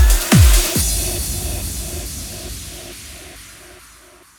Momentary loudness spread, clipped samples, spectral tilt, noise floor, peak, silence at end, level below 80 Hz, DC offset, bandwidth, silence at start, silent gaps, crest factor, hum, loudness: 24 LU; under 0.1%; -3.5 dB/octave; -45 dBFS; -2 dBFS; 0.7 s; -20 dBFS; under 0.1%; over 20 kHz; 0 s; none; 16 dB; none; -17 LUFS